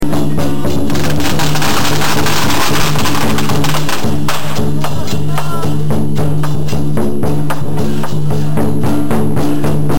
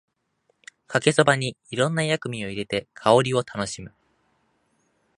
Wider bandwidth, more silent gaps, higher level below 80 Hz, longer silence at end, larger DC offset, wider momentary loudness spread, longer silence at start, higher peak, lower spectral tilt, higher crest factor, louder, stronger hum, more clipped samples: first, 17 kHz vs 11.5 kHz; neither; first, -34 dBFS vs -60 dBFS; second, 0 s vs 1.3 s; first, 40% vs under 0.1%; second, 4 LU vs 12 LU; second, 0 s vs 0.9 s; about the same, -2 dBFS vs -2 dBFS; about the same, -5 dB/octave vs -4.5 dB/octave; second, 8 dB vs 24 dB; first, -15 LUFS vs -23 LUFS; neither; neither